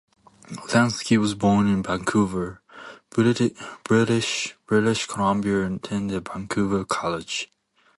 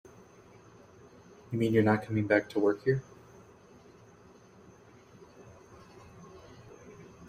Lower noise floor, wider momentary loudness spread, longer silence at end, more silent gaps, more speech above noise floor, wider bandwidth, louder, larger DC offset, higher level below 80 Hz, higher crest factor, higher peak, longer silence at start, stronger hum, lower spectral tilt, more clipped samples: second, -44 dBFS vs -57 dBFS; second, 13 LU vs 27 LU; first, 0.5 s vs 0.05 s; neither; second, 21 dB vs 29 dB; second, 11.5 kHz vs 14.5 kHz; first, -23 LUFS vs -29 LUFS; neither; first, -52 dBFS vs -66 dBFS; second, 18 dB vs 24 dB; first, -4 dBFS vs -10 dBFS; second, 0.5 s vs 1.5 s; neither; second, -5 dB/octave vs -8 dB/octave; neither